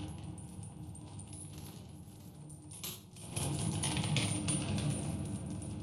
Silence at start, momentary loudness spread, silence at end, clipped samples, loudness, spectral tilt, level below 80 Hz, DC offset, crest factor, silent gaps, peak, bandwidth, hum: 0 s; 17 LU; 0 s; under 0.1%; -38 LUFS; -4 dB/octave; -56 dBFS; under 0.1%; 22 dB; none; -18 dBFS; 15 kHz; none